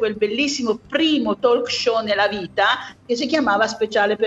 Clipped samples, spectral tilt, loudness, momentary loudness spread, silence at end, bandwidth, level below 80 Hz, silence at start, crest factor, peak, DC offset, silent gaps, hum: under 0.1%; -3 dB/octave; -20 LUFS; 4 LU; 0 s; 8.2 kHz; -58 dBFS; 0 s; 16 dB; -4 dBFS; under 0.1%; none; none